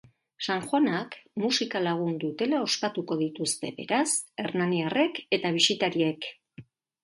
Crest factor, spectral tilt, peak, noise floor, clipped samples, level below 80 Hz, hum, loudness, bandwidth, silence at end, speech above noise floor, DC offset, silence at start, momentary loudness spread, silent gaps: 20 dB; -3.5 dB/octave; -10 dBFS; -51 dBFS; under 0.1%; -74 dBFS; none; -27 LUFS; 11.5 kHz; 0.4 s; 24 dB; under 0.1%; 0.4 s; 9 LU; none